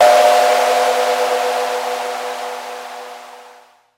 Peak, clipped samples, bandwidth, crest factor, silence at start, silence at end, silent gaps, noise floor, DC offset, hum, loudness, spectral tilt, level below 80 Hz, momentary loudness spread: 0 dBFS; under 0.1%; 16.5 kHz; 16 dB; 0 s; 0.5 s; none; -46 dBFS; under 0.1%; none; -16 LUFS; 0 dB/octave; -70 dBFS; 19 LU